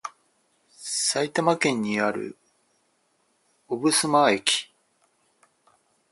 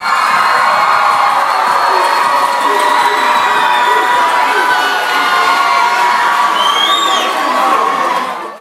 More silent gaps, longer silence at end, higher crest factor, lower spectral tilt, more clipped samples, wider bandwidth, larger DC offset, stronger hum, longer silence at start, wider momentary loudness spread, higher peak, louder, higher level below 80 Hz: neither; first, 1.5 s vs 0 s; first, 24 dB vs 10 dB; first, -2.5 dB/octave vs -0.5 dB/octave; neither; second, 12 kHz vs 16 kHz; neither; neither; about the same, 0.05 s vs 0 s; first, 18 LU vs 2 LU; about the same, -2 dBFS vs 0 dBFS; second, -23 LUFS vs -10 LUFS; about the same, -72 dBFS vs -68 dBFS